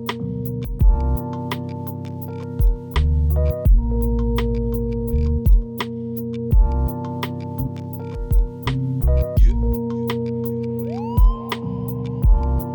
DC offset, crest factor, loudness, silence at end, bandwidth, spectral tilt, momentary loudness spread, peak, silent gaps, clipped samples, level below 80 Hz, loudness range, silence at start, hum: under 0.1%; 14 dB; -22 LUFS; 0 s; 19.5 kHz; -8 dB/octave; 9 LU; -6 dBFS; none; under 0.1%; -20 dBFS; 3 LU; 0 s; none